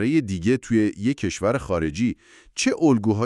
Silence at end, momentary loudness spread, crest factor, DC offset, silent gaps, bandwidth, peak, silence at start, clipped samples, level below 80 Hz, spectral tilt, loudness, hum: 0 s; 7 LU; 14 dB; under 0.1%; none; 11.5 kHz; -6 dBFS; 0 s; under 0.1%; -46 dBFS; -6 dB/octave; -23 LUFS; none